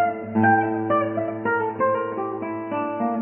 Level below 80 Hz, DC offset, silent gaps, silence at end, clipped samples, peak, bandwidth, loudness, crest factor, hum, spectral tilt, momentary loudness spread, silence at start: -64 dBFS; under 0.1%; none; 0 s; under 0.1%; -6 dBFS; 3.3 kHz; -23 LUFS; 18 dB; none; -11 dB/octave; 9 LU; 0 s